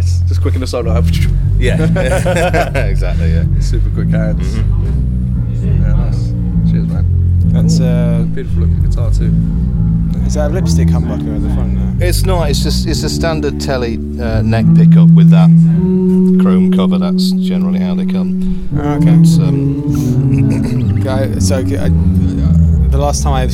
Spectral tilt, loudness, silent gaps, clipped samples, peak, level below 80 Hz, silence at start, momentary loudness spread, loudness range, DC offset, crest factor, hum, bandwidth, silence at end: -7.5 dB/octave; -12 LUFS; none; under 0.1%; 0 dBFS; -18 dBFS; 0 s; 8 LU; 6 LU; under 0.1%; 10 dB; none; 13.5 kHz; 0 s